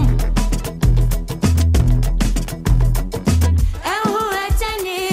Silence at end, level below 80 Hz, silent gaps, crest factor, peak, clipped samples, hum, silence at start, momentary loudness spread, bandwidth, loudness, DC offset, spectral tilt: 0 s; -18 dBFS; none; 12 dB; -2 dBFS; under 0.1%; none; 0 s; 5 LU; 16 kHz; -19 LUFS; under 0.1%; -5.5 dB/octave